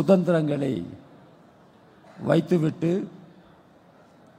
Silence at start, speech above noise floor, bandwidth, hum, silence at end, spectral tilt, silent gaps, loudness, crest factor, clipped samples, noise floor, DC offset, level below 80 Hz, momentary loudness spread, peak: 0 s; 32 dB; 11.5 kHz; none; 1.2 s; -8.5 dB/octave; none; -24 LUFS; 20 dB; under 0.1%; -54 dBFS; under 0.1%; -66 dBFS; 19 LU; -6 dBFS